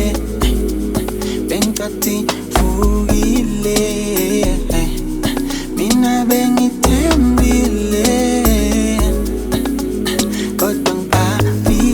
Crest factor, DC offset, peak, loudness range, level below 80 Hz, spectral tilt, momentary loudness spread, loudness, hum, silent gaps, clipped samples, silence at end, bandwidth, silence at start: 14 dB; under 0.1%; 0 dBFS; 3 LU; -22 dBFS; -5 dB/octave; 6 LU; -16 LUFS; none; none; under 0.1%; 0 s; 19 kHz; 0 s